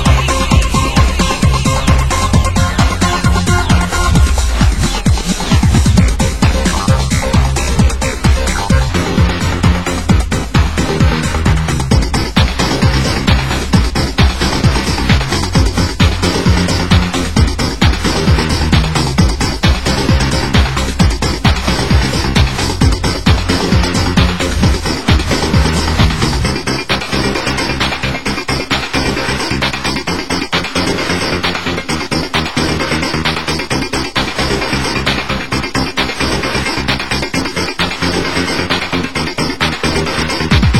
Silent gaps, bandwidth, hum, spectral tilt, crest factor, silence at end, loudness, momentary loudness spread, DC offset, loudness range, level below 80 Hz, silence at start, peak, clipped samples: none; 16 kHz; none; -4.5 dB/octave; 12 dB; 0 s; -13 LUFS; 4 LU; 3%; 3 LU; -18 dBFS; 0 s; 0 dBFS; 0.1%